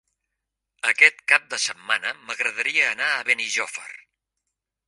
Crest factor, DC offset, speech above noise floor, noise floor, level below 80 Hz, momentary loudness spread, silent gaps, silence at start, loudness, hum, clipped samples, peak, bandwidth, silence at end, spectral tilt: 24 dB; under 0.1%; 60 dB; -82 dBFS; -78 dBFS; 12 LU; none; 0.85 s; -21 LUFS; none; under 0.1%; 0 dBFS; 11.5 kHz; 0.95 s; 1.5 dB/octave